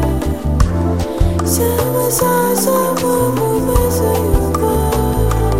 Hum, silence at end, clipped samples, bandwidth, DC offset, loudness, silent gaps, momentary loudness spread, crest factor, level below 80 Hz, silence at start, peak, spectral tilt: none; 0 s; under 0.1%; 16.5 kHz; 1%; -15 LUFS; none; 3 LU; 14 dB; -20 dBFS; 0 s; 0 dBFS; -5.5 dB/octave